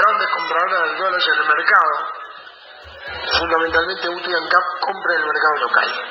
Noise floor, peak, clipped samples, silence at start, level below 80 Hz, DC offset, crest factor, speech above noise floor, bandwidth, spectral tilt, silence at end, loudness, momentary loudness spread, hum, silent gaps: -40 dBFS; 0 dBFS; under 0.1%; 0 s; -50 dBFS; under 0.1%; 18 dB; 22 dB; 7 kHz; -3.5 dB/octave; 0 s; -17 LUFS; 14 LU; none; none